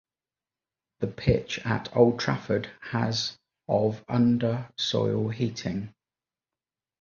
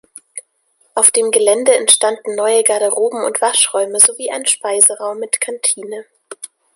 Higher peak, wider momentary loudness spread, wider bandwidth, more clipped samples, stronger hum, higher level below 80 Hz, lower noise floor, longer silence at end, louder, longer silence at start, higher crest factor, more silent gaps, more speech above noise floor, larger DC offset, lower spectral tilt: second, -6 dBFS vs 0 dBFS; second, 11 LU vs 22 LU; second, 7.2 kHz vs 16 kHz; second, under 0.1% vs 0.1%; neither; first, -52 dBFS vs -68 dBFS; first, under -90 dBFS vs -60 dBFS; first, 1.1 s vs 0.3 s; second, -27 LUFS vs -13 LUFS; first, 1 s vs 0.35 s; first, 22 dB vs 16 dB; neither; first, over 64 dB vs 45 dB; neither; first, -6 dB/octave vs 0.5 dB/octave